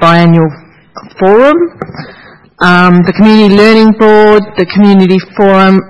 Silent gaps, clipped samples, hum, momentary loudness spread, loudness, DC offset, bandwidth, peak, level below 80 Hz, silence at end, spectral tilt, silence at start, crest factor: none; 5%; none; 9 LU; -6 LUFS; under 0.1%; 9.6 kHz; 0 dBFS; -40 dBFS; 0 s; -7.5 dB/octave; 0 s; 6 dB